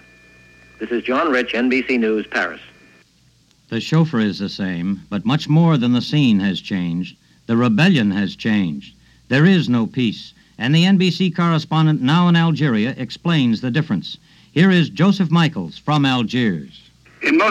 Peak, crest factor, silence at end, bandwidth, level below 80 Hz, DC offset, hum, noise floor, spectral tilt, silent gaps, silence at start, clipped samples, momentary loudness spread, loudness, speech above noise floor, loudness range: -2 dBFS; 16 dB; 0 s; 8.6 kHz; -56 dBFS; under 0.1%; none; -55 dBFS; -7 dB/octave; none; 0.8 s; under 0.1%; 10 LU; -18 LUFS; 39 dB; 4 LU